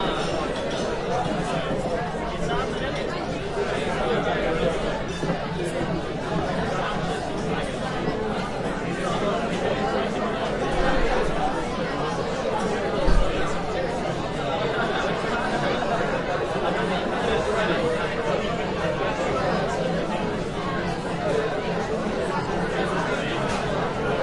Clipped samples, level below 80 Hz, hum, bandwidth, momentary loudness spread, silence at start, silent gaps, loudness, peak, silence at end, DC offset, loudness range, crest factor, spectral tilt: under 0.1%; -36 dBFS; none; 11.5 kHz; 4 LU; 0 s; none; -25 LUFS; -6 dBFS; 0 s; under 0.1%; 2 LU; 18 dB; -5.5 dB/octave